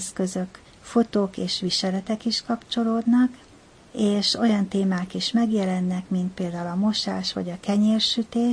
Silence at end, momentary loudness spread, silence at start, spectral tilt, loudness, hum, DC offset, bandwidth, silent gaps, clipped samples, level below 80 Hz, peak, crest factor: 0 s; 7 LU; 0 s; -5 dB/octave; -24 LUFS; none; under 0.1%; 10.5 kHz; none; under 0.1%; -58 dBFS; -10 dBFS; 14 dB